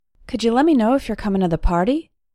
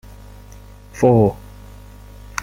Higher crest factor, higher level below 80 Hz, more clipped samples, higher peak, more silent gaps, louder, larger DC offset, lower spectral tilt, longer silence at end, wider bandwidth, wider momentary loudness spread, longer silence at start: second, 14 dB vs 20 dB; first, -30 dBFS vs -40 dBFS; neither; about the same, -4 dBFS vs -2 dBFS; neither; about the same, -19 LUFS vs -17 LUFS; neither; about the same, -7 dB/octave vs -7.5 dB/octave; first, 0.3 s vs 0 s; second, 13 kHz vs 16 kHz; second, 7 LU vs 25 LU; second, 0.3 s vs 0.95 s